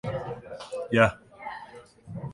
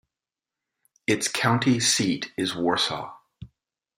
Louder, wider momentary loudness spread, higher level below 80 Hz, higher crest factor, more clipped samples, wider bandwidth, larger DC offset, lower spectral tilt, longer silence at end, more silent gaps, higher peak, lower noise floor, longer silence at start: about the same, -26 LUFS vs -24 LUFS; first, 21 LU vs 11 LU; first, -54 dBFS vs -64 dBFS; first, 26 dB vs 20 dB; neither; second, 11.5 kHz vs 16 kHz; neither; first, -6.5 dB/octave vs -3.5 dB/octave; second, 0 s vs 0.5 s; neither; about the same, -4 dBFS vs -6 dBFS; second, -48 dBFS vs -90 dBFS; second, 0.05 s vs 1.1 s